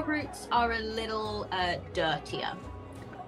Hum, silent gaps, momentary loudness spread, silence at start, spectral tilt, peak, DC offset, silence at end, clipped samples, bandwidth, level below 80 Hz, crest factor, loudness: none; none; 15 LU; 0 s; -4.5 dB/octave; -14 dBFS; under 0.1%; 0 s; under 0.1%; 15 kHz; -50 dBFS; 20 dB; -31 LUFS